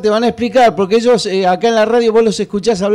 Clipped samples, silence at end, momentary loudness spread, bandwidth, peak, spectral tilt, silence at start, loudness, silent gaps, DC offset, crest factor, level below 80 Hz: under 0.1%; 0 s; 4 LU; 11.5 kHz; -4 dBFS; -5 dB/octave; 0 s; -12 LUFS; none; 0.2%; 8 dB; -48 dBFS